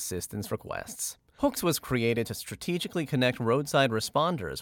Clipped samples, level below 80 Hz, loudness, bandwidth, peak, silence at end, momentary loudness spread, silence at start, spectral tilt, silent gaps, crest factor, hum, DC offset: under 0.1%; -56 dBFS; -29 LUFS; 19 kHz; -12 dBFS; 0 s; 10 LU; 0 s; -4.5 dB/octave; none; 18 dB; none; under 0.1%